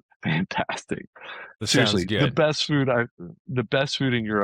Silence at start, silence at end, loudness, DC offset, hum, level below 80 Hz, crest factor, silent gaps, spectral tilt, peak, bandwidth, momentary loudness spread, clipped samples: 0.25 s; 0 s; -24 LUFS; under 0.1%; none; -58 dBFS; 16 dB; 1.07-1.13 s, 3.11-3.17 s, 3.39-3.45 s; -5 dB/octave; -8 dBFS; 16 kHz; 14 LU; under 0.1%